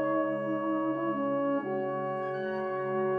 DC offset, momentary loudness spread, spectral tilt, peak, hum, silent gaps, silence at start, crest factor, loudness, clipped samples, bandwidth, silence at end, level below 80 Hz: under 0.1%; 4 LU; -9.5 dB/octave; -18 dBFS; none; none; 0 s; 12 dB; -31 LUFS; under 0.1%; 4.8 kHz; 0 s; -74 dBFS